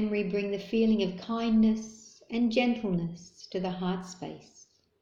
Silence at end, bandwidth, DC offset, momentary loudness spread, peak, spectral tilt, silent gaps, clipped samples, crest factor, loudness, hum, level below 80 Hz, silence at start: 0.6 s; 7.6 kHz; under 0.1%; 17 LU; -12 dBFS; -6.5 dB/octave; none; under 0.1%; 18 dB; -29 LUFS; none; -58 dBFS; 0 s